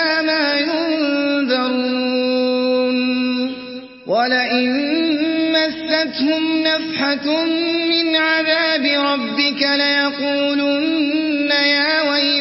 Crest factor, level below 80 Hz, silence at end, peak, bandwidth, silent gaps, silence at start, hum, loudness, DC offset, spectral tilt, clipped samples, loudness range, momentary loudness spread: 14 dB; -62 dBFS; 0 s; -4 dBFS; 5.8 kHz; none; 0 s; none; -17 LUFS; under 0.1%; -6 dB/octave; under 0.1%; 2 LU; 4 LU